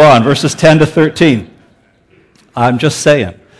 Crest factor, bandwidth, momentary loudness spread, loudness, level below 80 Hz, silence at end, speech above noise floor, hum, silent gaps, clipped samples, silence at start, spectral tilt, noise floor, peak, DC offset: 10 dB; 11 kHz; 7 LU; -10 LUFS; -42 dBFS; 0.25 s; 40 dB; none; none; under 0.1%; 0 s; -5.5 dB/octave; -49 dBFS; 0 dBFS; under 0.1%